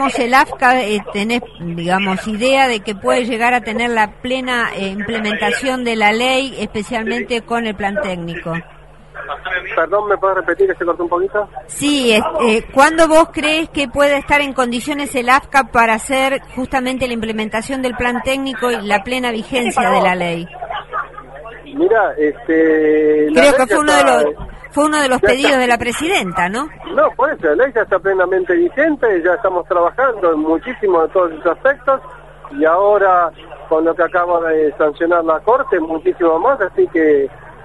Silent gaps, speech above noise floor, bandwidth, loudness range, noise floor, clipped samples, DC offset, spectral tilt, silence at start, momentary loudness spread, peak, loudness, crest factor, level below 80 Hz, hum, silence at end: none; 20 dB; 12 kHz; 5 LU; -34 dBFS; under 0.1%; 0.5%; -4 dB/octave; 0 s; 9 LU; 0 dBFS; -15 LUFS; 16 dB; -42 dBFS; none; 0 s